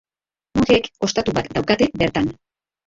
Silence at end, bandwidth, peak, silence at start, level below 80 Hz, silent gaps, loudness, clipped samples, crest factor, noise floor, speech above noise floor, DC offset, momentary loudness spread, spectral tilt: 0.55 s; 8 kHz; -2 dBFS; 0.55 s; -44 dBFS; none; -20 LUFS; under 0.1%; 18 dB; under -90 dBFS; over 71 dB; under 0.1%; 7 LU; -5 dB/octave